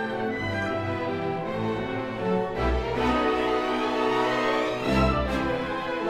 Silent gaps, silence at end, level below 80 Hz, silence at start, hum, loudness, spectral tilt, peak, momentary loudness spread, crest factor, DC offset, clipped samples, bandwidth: none; 0 s; -38 dBFS; 0 s; none; -26 LUFS; -6.5 dB/octave; -10 dBFS; 5 LU; 16 dB; under 0.1%; under 0.1%; 15 kHz